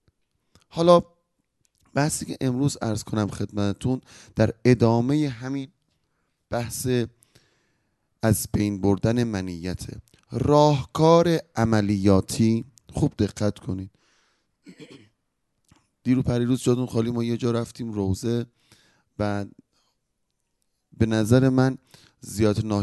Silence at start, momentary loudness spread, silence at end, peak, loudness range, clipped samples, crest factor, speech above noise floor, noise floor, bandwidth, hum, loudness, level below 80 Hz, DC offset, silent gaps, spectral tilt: 0.75 s; 15 LU; 0 s; -4 dBFS; 9 LU; under 0.1%; 22 dB; 54 dB; -76 dBFS; 12.5 kHz; none; -23 LUFS; -46 dBFS; under 0.1%; none; -6.5 dB/octave